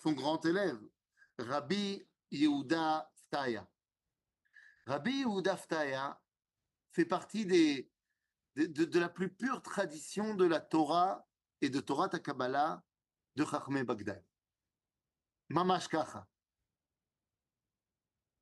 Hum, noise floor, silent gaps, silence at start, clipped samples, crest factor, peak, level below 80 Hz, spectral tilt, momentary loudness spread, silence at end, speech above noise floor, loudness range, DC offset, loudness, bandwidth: none; under -90 dBFS; none; 0.05 s; under 0.1%; 20 dB; -16 dBFS; -82 dBFS; -5.5 dB/octave; 13 LU; 2.15 s; over 56 dB; 5 LU; under 0.1%; -35 LUFS; 11.5 kHz